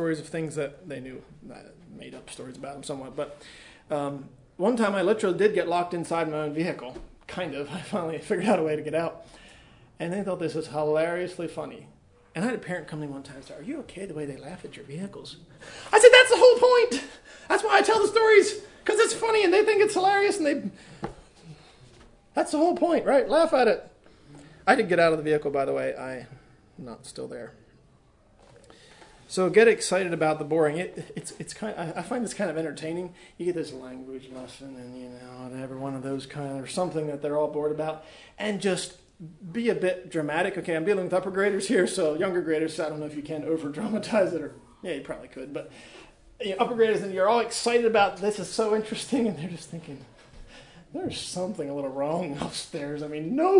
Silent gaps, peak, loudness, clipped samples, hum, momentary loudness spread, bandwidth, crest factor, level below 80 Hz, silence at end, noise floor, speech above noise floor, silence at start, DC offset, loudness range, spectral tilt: none; 0 dBFS; -25 LUFS; under 0.1%; none; 20 LU; 11 kHz; 26 dB; -60 dBFS; 0 s; -59 dBFS; 34 dB; 0 s; under 0.1%; 15 LU; -4 dB/octave